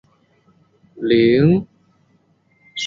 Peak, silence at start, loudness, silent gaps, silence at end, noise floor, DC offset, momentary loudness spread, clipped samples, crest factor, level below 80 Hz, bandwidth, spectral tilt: -4 dBFS; 0.95 s; -16 LUFS; none; 0 s; -59 dBFS; under 0.1%; 15 LU; under 0.1%; 16 dB; -54 dBFS; 7.6 kHz; -7 dB/octave